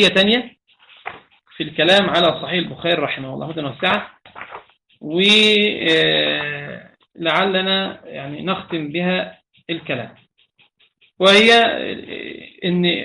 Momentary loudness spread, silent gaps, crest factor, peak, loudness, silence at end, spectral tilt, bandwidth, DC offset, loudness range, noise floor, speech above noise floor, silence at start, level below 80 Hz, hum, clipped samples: 23 LU; none; 18 dB; -2 dBFS; -17 LUFS; 0 s; -4.5 dB/octave; 11.5 kHz; under 0.1%; 5 LU; -59 dBFS; 41 dB; 0 s; -58 dBFS; none; under 0.1%